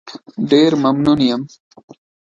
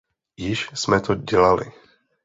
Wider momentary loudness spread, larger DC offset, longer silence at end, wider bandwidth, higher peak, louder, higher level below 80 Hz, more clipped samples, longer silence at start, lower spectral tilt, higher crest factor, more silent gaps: first, 17 LU vs 12 LU; neither; first, 0.8 s vs 0.55 s; about the same, 7.8 kHz vs 8 kHz; about the same, 0 dBFS vs -2 dBFS; first, -15 LUFS vs -21 LUFS; second, -52 dBFS vs -46 dBFS; neither; second, 0.05 s vs 0.4 s; first, -6.5 dB/octave vs -5 dB/octave; about the same, 16 dB vs 20 dB; neither